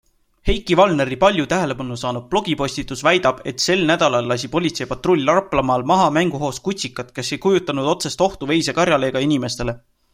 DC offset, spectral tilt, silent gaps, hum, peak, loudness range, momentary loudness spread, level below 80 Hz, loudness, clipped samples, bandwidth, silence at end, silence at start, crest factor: under 0.1%; -4.5 dB/octave; none; none; -2 dBFS; 2 LU; 9 LU; -38 dBFS; -19 LUFS; under 0.1%; 16 kHz; 0.35 s; 0.45 s; 18 dB